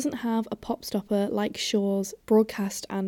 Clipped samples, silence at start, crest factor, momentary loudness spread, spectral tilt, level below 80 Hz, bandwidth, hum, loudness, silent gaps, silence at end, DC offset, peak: under 0.1%; 0 s; 16 dB; 8 LU; -5 dB/octave; -60 dBFS; 18 kHz; none; -27 LUFS; none; 0 s; under 0.1%; -12 dBFS